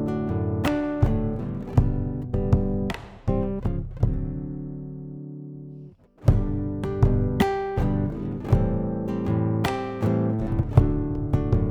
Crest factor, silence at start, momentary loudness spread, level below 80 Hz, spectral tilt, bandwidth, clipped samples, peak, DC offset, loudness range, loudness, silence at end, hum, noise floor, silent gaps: 22 dB; 0 s; 13 LU; -32 dBFS; -8.5 dB/octave; 15 kHz; under 0.1%; -2 dBFS; under 0.1%; 5 LU; -25 LUFS; 0 s; none; -45 dBFS; none